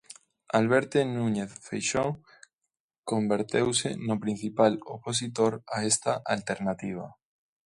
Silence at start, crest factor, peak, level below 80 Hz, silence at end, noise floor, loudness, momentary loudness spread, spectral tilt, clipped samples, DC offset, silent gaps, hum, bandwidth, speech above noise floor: 0.55 s; 20 dB; -8 dBFS; -64 dBFS; 0.55 s; -85 dBFS; -28 LUFS; 11 LU; -4 dB/octave; under 0.1%; under 0.1%; 2.53-2.61 s, 2.80-2.89 s, 2.98-3.03 s; none; 11.5 kHz; 57 dB